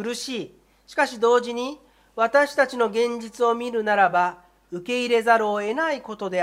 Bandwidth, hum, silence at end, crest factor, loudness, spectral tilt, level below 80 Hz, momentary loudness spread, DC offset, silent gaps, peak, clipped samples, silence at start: 14.5 kHz; none; 0 s; 18 dB; -22 LUFS; -3.5 dB/octave; -66 dBFS; 12 LU; under 0.1%; none; -4 dBFS; under 0.1%; 0 s